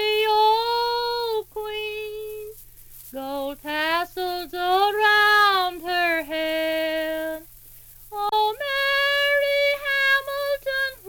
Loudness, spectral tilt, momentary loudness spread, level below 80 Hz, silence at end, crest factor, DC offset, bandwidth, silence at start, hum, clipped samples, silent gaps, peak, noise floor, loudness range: -22 LUFS; -1.5 dB/octave; 14 LU; -54 dBFS; 0 s; 18 dB; under 0.1%; over 20 kHz; 0 s; none; under 0.1%; none; -6 dBFS; -46 dBFS; 8 LU